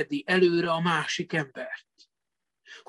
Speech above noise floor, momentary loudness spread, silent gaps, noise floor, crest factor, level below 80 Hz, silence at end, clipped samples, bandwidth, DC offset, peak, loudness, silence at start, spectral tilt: 61 dB; 16 LU; none; -87 dBFS; 18 dB; -72 dBFS; 0.1 s; under 0.1%; 11 kHz; under 0.1%; -10 dBFS; -26 LUFS; 0 s; -5 dB/octave